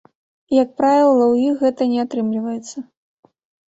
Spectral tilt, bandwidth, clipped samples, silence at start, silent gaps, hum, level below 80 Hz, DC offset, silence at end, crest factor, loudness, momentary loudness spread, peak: -6 dB/octave; 8 kHz; under 0.1%; 0.5 s; none; none; -64 dBFS; under 0.1%; 0.85 s; 16 dB; -17 LUFS; 14 LU; -4 dBFS